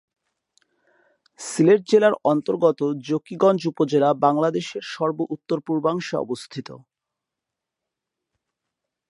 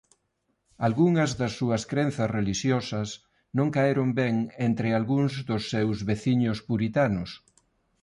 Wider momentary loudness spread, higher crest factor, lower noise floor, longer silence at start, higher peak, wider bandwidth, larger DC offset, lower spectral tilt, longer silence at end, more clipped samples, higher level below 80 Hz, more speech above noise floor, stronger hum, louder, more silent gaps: first, 13 LU vs 8 LU; about the same, 20 dB vs 16 dB; first, -85 dBFS vs -75 dBFS; first, 1.4 s vs 0.8 s; first, -4 dBFS vs -12 dBFS; about the same, 11.5 kHz vs 11.5 kHz; neither; about the same, -6 dB/octave vs -6.5 dB/octave; first, 2.3 s vs 0.65 s; neither; second, -74 dBFS vs -54 dBFS; first, 64 dB vs 50 dB; neither; first, -21 LUFS vs -26 LUFS; neither